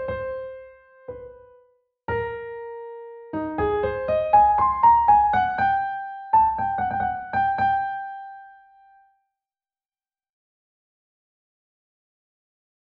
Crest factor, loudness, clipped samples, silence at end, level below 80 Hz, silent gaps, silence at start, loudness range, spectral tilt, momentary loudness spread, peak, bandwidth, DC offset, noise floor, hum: 18 dB; -21 LUFS; under 0.1%; 4.3 s; -48 dBFS; none; 0 s; 14 LU; -4 dB/octave; 22 LU; -6 dBFS; 4.9 kHz; under 0.1%; under -90 dBFS; none